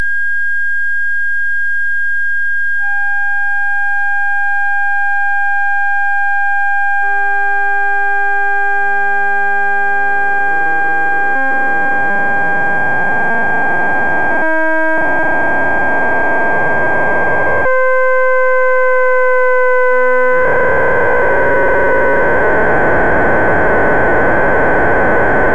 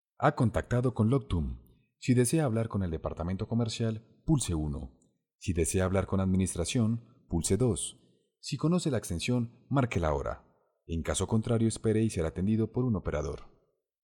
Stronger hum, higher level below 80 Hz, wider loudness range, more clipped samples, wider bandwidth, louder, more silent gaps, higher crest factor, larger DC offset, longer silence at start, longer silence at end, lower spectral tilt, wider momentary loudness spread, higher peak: neither; first, -36 dBFS vs -48 dBFS; about the same, 3 LU vs 2 LU; neither; second, 11 kHz vs 17.5 kHz; first, -13 LUFS vs -30 LUFS; second, none vs 5.35-5.39 s; second, 10 dB vs 20 dB; first, 20% vs under 0.1%; second, 0 s vs 0.2 s; second, 0 s vs 0.6 s; about the same, -6.5 dB/octave vs -6 dB/octave; second, 3 LU vs 11 LU; first, -2 dBFS vs -12 dBFS